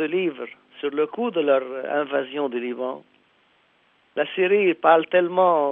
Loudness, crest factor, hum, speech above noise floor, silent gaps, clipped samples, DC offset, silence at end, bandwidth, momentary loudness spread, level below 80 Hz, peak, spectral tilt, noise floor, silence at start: -22 LUFS; 20 dB; none; 40 dB; none; under 0.1%; under 0.1%; 0 s; 3.9 kHz; 13 LU; -82 dBFS; -4 dBFS; -8.5 dB/octave; -62 dBFS; 0 s